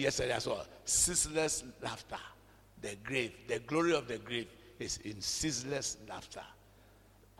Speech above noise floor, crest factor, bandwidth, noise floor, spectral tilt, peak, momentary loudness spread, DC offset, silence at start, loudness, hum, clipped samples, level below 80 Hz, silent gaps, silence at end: 26 dB; 20 dB; 16.5 kHz; -62 dBFS; -2.5 dB/octave; -16 dBFS; 17 LU; under 0.1%; 0 s; -35 LUFS; none; under 0.1%; -58 dBFS; none; 0.85 s